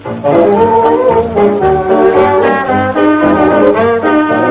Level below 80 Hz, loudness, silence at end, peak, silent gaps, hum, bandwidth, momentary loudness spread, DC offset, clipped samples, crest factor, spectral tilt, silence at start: -34 dBFS; -9 LUFS; 0 s; 0 dBFS; none; none; 4 kHz; 3 LU; under 0.1%; 0.4%; 8 dB; -10.5 dB/octave; 0 s